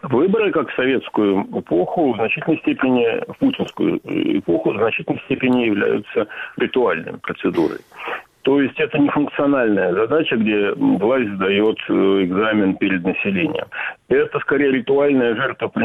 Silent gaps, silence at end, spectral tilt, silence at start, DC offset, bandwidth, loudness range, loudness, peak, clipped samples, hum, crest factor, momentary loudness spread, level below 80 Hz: none; 0 s; -8 dB/octave; 0.05 s; under 0.1%; 5.8 kHz; 3 LU; -19 LUFS; -6 dBFS; under 0.1%; none; 12 dB; 7 LU; -56 dBFS